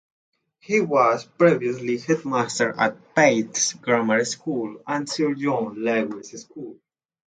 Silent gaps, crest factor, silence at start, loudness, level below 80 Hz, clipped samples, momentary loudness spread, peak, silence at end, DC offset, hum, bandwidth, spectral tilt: none; 20 dB; 0.7 s; -22 LUFS; -70 dBFS; under 0.1%; 12 LU; -4 dBFS; 0.65 s; under 0.1%; none; 9.6 kHz; -4 dB/octave